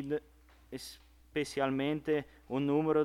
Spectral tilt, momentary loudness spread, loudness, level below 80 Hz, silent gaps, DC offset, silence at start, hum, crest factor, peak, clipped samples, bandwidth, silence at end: -6 dB/octave; 15 LU; -34 LUFS; -62 dBFS; none; under 0.1%; 0 s; none; 16 dB; -18 dBFS; under 0.1%; 15 kHz; 0 s